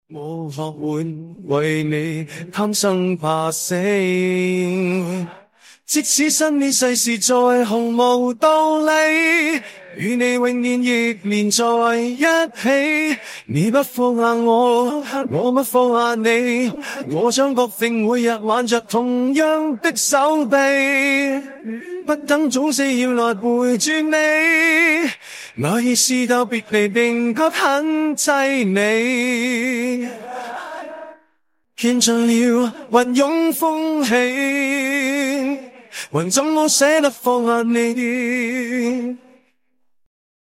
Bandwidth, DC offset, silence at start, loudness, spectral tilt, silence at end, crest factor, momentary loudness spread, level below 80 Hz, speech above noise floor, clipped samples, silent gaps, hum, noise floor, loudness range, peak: 16.5 kHz; under 0.1%; 0.1 s; -17 LUFS; -3.5 dB/octave; 1.3 s; 16 dB; 11 LU; -68 dBFS; 52 dB; under 0.1%; none; none; -69 dBFS; 4 LU; -2 dBFS